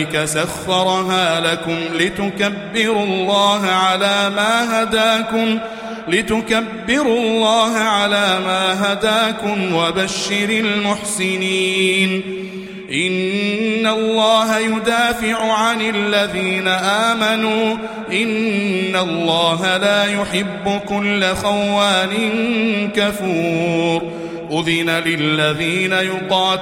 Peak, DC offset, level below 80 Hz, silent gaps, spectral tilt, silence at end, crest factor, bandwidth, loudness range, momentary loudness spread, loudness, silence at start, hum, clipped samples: -2 dBFS; under 0.1%; -50 dBFS; none; -4 dB/octave; 0 s; 16 dB; 16.5 kHz; 2 LU; 5 LU; -16 LUFS; 0 s; none; under 0.1%